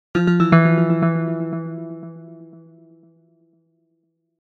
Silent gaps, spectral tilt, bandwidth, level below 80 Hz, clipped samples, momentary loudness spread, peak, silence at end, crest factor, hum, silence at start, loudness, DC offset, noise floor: none; -9 dB/octave; 6.2 kHz; -56 dBFS; under 0.1%; 23 LU; 0 dBFS; 1.95 s; 20 dB; none; 0.15 s; -18 LUFS; under 0.1%; -69 dBFS